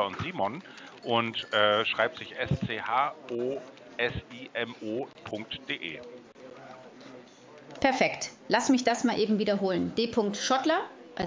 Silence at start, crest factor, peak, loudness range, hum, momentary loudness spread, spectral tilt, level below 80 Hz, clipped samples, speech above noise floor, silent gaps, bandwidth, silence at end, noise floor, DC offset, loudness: 0 s; 22 dB; -8 dBFS; 9 LU; none; 22 LU; -4 dB/octave; -58 dBFS; under 0.1%; 22 dB; none; 7.6 kHz; 0 s; -51 dBFS; under 0.1%; -29 LUFS